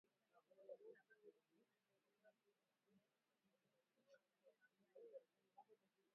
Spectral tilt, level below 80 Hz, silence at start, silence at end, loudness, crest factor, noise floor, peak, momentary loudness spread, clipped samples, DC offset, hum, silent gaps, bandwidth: -0.5 dB/octave; under -90 dBFS; 0.05 s; 0 s; -65 LUFS; 24 dB; -89 dBFS; -48 dBFS; 5 LU; under 0.1%; under 0.1%; none; none; 3.9 kHz